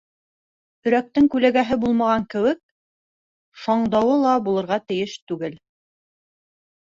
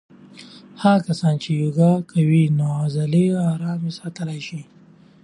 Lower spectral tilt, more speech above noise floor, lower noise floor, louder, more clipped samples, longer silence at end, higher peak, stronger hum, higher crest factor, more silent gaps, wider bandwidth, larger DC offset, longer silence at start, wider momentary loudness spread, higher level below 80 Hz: second, -6.5 dB/octave vs -8 dB/octave; first, over 70 dB vs 24 dB; first, under -90 dBFS vs -43 dBFS; about the same, -21 LUFS vs -20 LUFS; neither; first, 1.3 s vs 0.6 s; about the same, -4 dBFS vs -2 dBFS; neither; about the same, 18 dB vs 18 dB; first, 2.63-3.52 s, 5.22-5.27 s vs none; second, 7.6 kHz vs 11 kHz; neither; first, 0.85 s vs 0.35 s; about the same, 12 LU vs 12 LU; first, -56 dBFS vs -62 dBFS